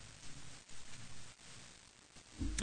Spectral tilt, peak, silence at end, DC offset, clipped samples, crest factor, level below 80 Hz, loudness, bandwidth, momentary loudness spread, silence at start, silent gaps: -3 dB/octave; -22 dBFS; 0 s; under 0.1%; under 0.1%; 26 dB; -54 dBFS; -52 LUFS; 9.6 kHz; 11 LU; 0 s; none